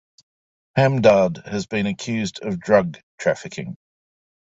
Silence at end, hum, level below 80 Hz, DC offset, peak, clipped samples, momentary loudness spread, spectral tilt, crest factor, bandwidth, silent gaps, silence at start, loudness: 0.85 s; none; -56 dBFS; under 0.1%; -2 dBFS; under 0.1%; 15 LU; -6 dB/octave; 20 dB; 8 kHz; 3.03-3.18 s; 0.75 s; -21 LUFS